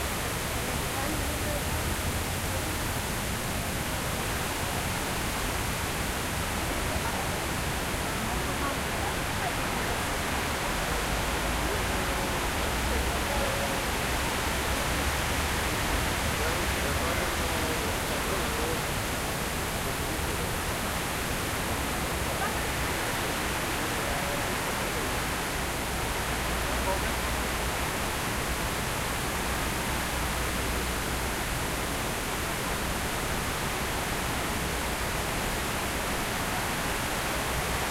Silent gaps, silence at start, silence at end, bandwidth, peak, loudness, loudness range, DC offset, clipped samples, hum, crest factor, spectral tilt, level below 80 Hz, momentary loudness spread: none; 0 s; 0 s; 16 kHz; -14 dBFS; -29 LUFS; 2 LU; under 0.1%; under 0.1%; none; 14 dB; -3.5 dB/octave; -38 dBFS; 2 LU